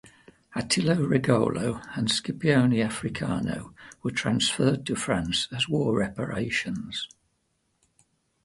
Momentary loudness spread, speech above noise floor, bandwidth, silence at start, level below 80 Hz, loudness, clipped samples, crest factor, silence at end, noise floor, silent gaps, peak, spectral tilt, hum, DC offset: 11 LU; 47 dB; 11.5 kHz; 0.5 s; -54 dBFS; -26 LUFS; under 0.1%; 20 dB; 1.4 s; -73 dBFS; none; -6 dBFS; -5 dB/octave; none; under 0.1%